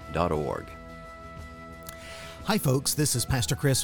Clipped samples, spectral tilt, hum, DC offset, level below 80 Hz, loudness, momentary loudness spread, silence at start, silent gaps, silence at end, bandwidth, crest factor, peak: under 0.1%; -4 dB/octave; none; under 0.1%; -46 dBFS; -27 LUFS; 18 LU; 0 s; none; 0 s; 19 kHz; 20 dB; -10 dBFS